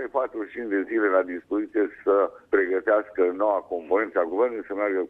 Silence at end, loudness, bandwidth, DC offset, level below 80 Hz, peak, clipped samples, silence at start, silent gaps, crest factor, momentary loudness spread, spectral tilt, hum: 0 s; -25 LUFS; 3.9 kHz; under 0.1%; -64 dBFS; -8 dBFS; under 0.1%; 0 s; none; 16 dB; 6 LU; -7.5 dB/octave; none